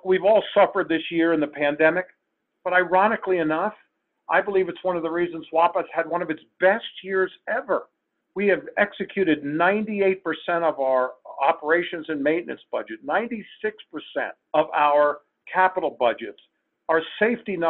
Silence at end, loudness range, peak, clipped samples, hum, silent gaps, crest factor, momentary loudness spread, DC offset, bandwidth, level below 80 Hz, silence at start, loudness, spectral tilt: 0 s; 3 LU; -4 dBFS; under 0.1%; none; none; 18 dB; 11 LU; under 0.1%; 4.3 kHz; -68 dBFS; 0.05 s; -23 LUFS; -9 dB/octave